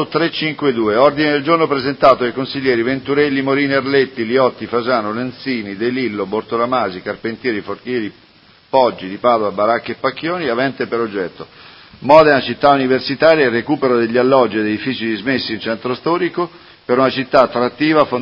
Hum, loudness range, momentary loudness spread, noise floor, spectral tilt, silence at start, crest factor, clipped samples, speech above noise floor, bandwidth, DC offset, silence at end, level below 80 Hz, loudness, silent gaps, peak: none; 6 LU; 10 LU; -48 dBFS; -7.5 dB/octave; 0 s; 16 dB; under 0.1%; 32 dB; 7 kHz; under 0.1%; 0 s; -54 dBFS; -16 LUFS; none; 0 dBFS